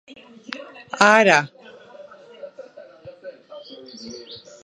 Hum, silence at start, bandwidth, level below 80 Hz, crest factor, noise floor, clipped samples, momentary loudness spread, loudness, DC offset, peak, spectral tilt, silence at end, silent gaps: none; 0.55 s; 11.5 kHz; -72 dBFS; 24 dB; -44 dBFS; under 0.1%; 27 LU; -15 LUFS; under 0.1%; 0 dBFS; -3.5 dB/octave; 0.3 s; none